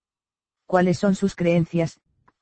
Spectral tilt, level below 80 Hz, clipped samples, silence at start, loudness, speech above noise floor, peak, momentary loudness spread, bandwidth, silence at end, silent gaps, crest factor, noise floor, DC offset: -7 dB/octave; -54 dBFS; under 0.1%; 0.7 s; -22 LUFS; over 69 dB; -6 dBFS; 5 LU; 8.8 kHz; 0.5 s; none; 18 dB; under -90 dBFS; under 0.1%